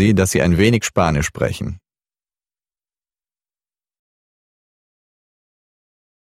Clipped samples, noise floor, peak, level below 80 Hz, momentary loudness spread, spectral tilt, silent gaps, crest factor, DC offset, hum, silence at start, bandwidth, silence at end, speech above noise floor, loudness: under 0.1%; under -90 dBFS; 0 dBFS; -40 dBFS; 14 LU; -5.5 dB/octave; none; 20 dB; under 0.1%; none; 0 s; 16 kHz; 4.5 s; over 74 dB; -17 LUFS